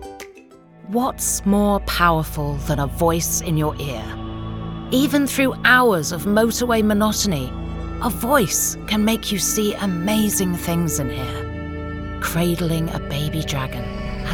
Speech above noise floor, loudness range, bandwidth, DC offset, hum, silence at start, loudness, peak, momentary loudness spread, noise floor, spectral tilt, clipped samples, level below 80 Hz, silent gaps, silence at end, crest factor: 26 dB; 5 LU; 19.5 kHz; 0.2%; none; 0 s; -20 LUFS; -2 dBFS; 12 LU; -46 dBFS; -4 dB/octave; under 0.1%; -34 dBFS; none; 0 s; 20 dB